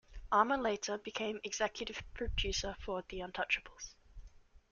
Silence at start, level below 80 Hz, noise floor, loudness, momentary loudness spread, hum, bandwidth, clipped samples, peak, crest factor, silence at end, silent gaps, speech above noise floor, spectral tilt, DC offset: 0.1 s; -50 dBFS; -58 dBFS; -37 LUFS; 12 LU; none; 7.4 kHz; under 0.1%; -14 dBFS; 24 dB; 0.35 s; none; 21 dB; -3 dB/octave; under 0.1%